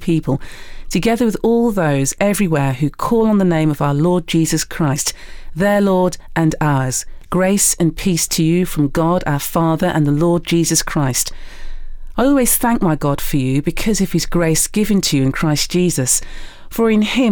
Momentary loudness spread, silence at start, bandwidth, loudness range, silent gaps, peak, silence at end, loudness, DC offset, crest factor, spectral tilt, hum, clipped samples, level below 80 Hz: 5 LU; 0 s; over 20 kHz; 1 LU; none; -4 dBFS; 0 s; -16 LUFS; under 0.1%; 12 dB; -5 dB/octave; none; under 0.1%; -30 dBFS